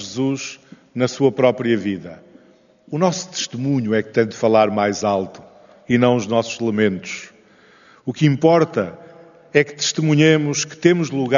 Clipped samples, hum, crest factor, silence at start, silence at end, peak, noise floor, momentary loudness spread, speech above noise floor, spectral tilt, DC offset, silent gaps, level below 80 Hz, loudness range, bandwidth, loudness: under 0.1%; none; 20 dB; 0 s; 0 s; 0 dBFS; -52 dBFS; 14 LU; 34 dB; -5 dB/octave; under 0.1%; none; -64 dBFS; 4 LU; 7.4 kHz; -18 LUFS